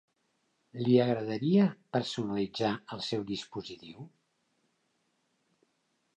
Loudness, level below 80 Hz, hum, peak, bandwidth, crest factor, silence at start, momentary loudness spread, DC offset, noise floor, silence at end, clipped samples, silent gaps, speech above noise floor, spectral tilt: -30 LUFS; -72 dBFS; none; -12 dBFS; 9.2 kHz; 22 dB; 0.75 s; 20 LU; under 0.1%; -77 dBFS; 2.1 s; under 0.1%; none; 46 dB; -7 dB/octave